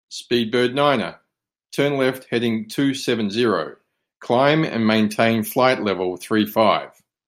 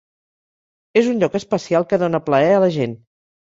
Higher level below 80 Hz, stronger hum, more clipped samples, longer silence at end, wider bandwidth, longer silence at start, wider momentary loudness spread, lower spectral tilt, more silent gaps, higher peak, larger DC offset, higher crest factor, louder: second, -66 dBFS vs -60 dBFS; neither; neither; about the same, 0.4 s vs 0.45 s; first, 16 kHz vs 7.8 kHz; second, 0.1 s vs 0.95 s; about the same, 7 LU vs 7 LU; about the same, -5.5 dB/octave vs -6.5 dB/octave; neither; about the same, -2 dBFS vs -2 dBFS; neither; about the same, 18 dB vs 18 dB; about the same, -20 LUFS vs -18 LUFS